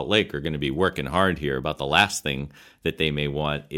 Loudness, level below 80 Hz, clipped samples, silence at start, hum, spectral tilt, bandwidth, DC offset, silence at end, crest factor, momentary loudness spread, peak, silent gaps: -24 LUFS; -44 dBFS; under 0.1%; 0 s; none; -4.5 dB/octave; 16.5 kHz; under 0.1%; 0 s; 22 dB; 10 LU; -4 dBFS; none